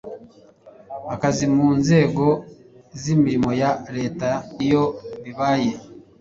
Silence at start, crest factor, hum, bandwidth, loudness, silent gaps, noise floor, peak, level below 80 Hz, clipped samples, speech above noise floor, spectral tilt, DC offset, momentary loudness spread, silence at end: 0.05 s; 18 dB; none; 7.8 kHz; -21 LUFS; none; -48 dBFS; -4 dBFS; -52 dBFS; under 0.1%; 28 dB; -6.5 dB/octave; under 0.1%; 18 LU; 0.2 s